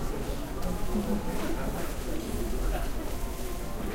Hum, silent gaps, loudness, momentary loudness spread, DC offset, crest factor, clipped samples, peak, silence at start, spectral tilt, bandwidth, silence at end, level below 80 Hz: none; none; -34 LUFS; 5 LU; under 0.1%; 12 dB; under 0.1%; -18 dBFS; 0 s; -5.5 dB/octave; 16 kHz; 0 s; -34 dBFS